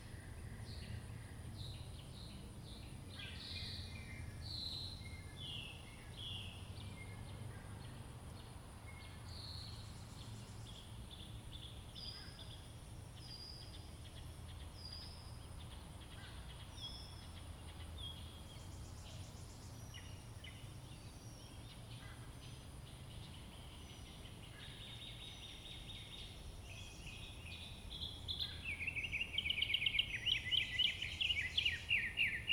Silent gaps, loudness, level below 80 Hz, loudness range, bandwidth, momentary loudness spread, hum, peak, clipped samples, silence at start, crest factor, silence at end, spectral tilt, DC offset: none; -45 LUFS; -58 dBFS; 16 LU; 19 kHz; 17 LU; none; -24 dBFS; under 0.1%; 0 s; 24 dB; 0 s; -3 dB/octave; under 0.1%